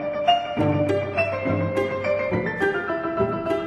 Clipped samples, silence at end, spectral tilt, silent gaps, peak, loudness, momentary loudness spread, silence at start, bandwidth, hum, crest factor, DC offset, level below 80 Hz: under 0.1%; 0 s; -7 dB/octave; none; -6 dBFS; -23 LUFS; 3 LU; 0 s; 12.5 kHz; none; 16 dB; under 0.1%; -52 dBFS